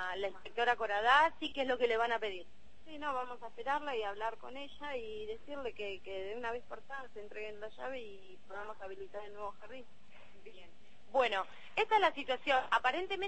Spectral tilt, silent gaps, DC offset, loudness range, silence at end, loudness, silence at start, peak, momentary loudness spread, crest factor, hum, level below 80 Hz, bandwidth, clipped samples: -3 dB/octave; none; 0.5%; 13 LU; 0 s; -36 LUFS; 0 s; -14 dBFS; 17 LU; 22 dB; none; -68 dBFS; 8.4 kHz; under 0.1%